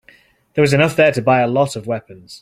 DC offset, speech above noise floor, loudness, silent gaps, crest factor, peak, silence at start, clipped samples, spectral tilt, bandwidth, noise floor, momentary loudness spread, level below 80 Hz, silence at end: under 0.1%; 35 dB; -16 LUFS; none; 16 dB; -2 dBFS; 0.55 s; under 0.1%; -6 dB/octave; 15.5 kHz; -51 dBFS; 12 LU; -54 dBFS; 0.05 s